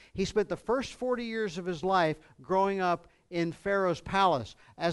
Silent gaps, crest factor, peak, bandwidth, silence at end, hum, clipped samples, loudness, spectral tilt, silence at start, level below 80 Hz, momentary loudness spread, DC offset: none; 18 dB; -12 dBFS; 11.5 kHz; 0 s; none; under 0.1%; -30 LUFS; -5.5 dB/octave; 0.15 s; -56 dBFS; 7 LU; under 0.1%